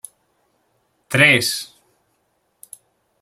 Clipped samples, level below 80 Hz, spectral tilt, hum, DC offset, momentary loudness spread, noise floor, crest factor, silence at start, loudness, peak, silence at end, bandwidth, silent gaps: under 0.1%; -64 dBFS; -3 dB/octave; none; under 0.1%; 25 LU; -67 dBFS; 22 dB; 1.1 s; -15 LUFS; -2 dBFS; 1.55 s; 16.5 kHz; none